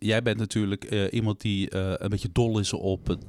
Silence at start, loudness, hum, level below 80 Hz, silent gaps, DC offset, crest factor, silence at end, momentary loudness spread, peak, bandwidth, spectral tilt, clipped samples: 0 s; -27 LUFS; none; -46 dBFS; none; under 0.1%; 16 dB; 0 s; 4 LU; -12 dBFS; 12.5 kHz; -5.5 dB/octave; under 0.1%